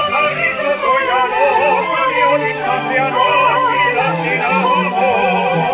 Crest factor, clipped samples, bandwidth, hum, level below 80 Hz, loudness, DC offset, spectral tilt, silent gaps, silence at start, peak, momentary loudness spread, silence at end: 12 dB; under 0.1%; 4 kHz; none; -52 dBFS; -14 LUFS; under 0.1%; -8 dB/octave; none; 0 s; -2 dBFS; 3 LU; 0 s